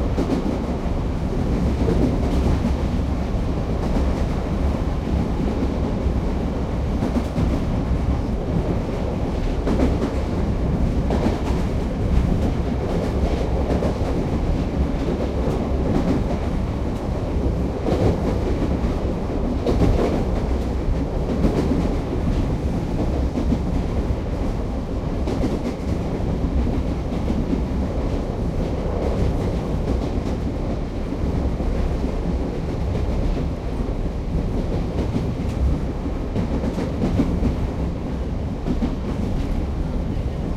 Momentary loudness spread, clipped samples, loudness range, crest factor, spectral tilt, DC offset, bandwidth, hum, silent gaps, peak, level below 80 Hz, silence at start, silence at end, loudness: 5 LU; under 0.1%; 3 LU; 16 dB; -8 dB/octave; under 0.1%; 11.5 kHz; none; none; -4 dBFS; -26 dBFS; 0 s; 0 s; -23 LUFS